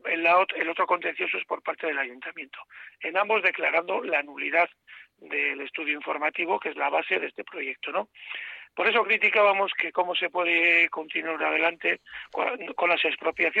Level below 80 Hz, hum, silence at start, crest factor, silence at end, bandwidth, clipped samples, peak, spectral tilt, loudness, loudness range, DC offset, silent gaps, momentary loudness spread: -74 dBFS; none; 0.05 s; 18 dB; 0 s; 7.8 kHz; under 0.1%; -8 dBFS; -4.5 dB/octave; -25 LUFS; 5 LU; under 0.1%; none; 14 LU